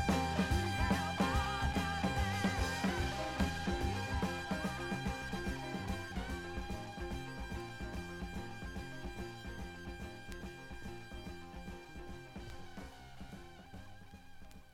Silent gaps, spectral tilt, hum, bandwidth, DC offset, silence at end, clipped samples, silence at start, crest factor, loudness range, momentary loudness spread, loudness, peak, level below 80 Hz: none; -5 dB/octave; none; 16 kHz; under 0.1%; 0 s; under 0.1%; 0 s; 20 dB; 15 LU; 18 LU; -39 LUFS; -18 dBFS; -46 dBFS